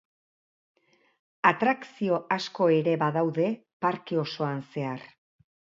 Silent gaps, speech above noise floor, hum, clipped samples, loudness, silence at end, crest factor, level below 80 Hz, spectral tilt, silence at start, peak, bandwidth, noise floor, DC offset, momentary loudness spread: 3.73-3.80 s; over 64 dB; none; under 0.1%; -27 LUFS; 0.75 s; 24 dB; -76 dBFS; -7 dB/octave; 1.45 s; -4 dBFS; 7.6 kHz; under -90 dBFS; under 0.1%; 10 LU